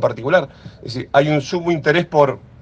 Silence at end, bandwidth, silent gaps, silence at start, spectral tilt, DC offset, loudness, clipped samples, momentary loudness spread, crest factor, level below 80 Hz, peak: 0.25 s; 8 kHz; none; 0 s; -6.5 dB/octave; under 0.1%; -17 LUFS; under 0.1%; 14 LU; 18 dB; -52 dBFS; 0 dBFS